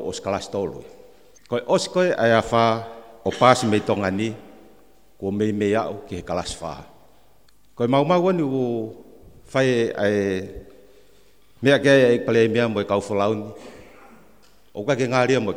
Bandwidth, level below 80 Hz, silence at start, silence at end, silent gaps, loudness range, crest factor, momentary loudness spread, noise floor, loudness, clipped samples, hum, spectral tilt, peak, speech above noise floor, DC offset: 16 kHz; -54 dBFS; 0 s; 0 s; none; 5 LU; 22 dB; 16 LU; -59 dBFS; -21 LUFS; under 0.1%; none; -5.5 dB/octave; 0 dBFS; 38 dB; 0.3%